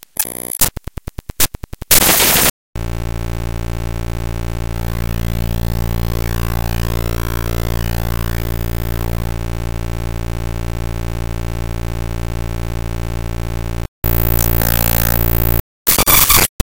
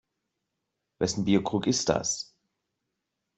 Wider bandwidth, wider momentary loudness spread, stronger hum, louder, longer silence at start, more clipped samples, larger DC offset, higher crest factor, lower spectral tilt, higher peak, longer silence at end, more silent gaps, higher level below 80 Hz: first, over 20 kHz vs 8.2 kHz; first, 14 LU vs 8 LU; neither; first, -17 LUFS vs -27 LUFS; second, 0 s vs 1 s; neither; neither; second, 18 dB vs 24 dB; about the same, -3.5 dB/octave vs -4 dB/octave; first, 0 dBFS vs -8 dBFS; second, 0 s vs 1.15 s; first, 2.50-2.73 s, 13.88-14.02 s, 15.60-15.85 s, 16.49-16.59 s vs none; first, -22 dBFS vs -60 dBFS